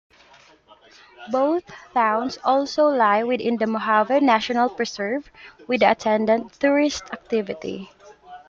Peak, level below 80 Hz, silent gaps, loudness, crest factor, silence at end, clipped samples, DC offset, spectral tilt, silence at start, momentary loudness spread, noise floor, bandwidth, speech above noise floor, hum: -2 dBFS; -62 dBFS; none; -21 LUFS; 20 dB; 0.1 s; under 0.1%; under 0.1%; -4.5 dB/octave; 1.2 s; 9 LU; -52 dBFS; 7.6 kHz; 31 dB; none